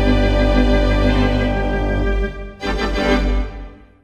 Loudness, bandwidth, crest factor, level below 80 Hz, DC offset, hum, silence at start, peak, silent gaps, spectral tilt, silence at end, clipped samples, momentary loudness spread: -18 LUFS; 8.4 kHz; 14 dB; -20 dBFS; under 0.1%; none; 0 s; -2 dBFS; none; -7 dB/octave; 0.3 s; under 0.1%; 10 LU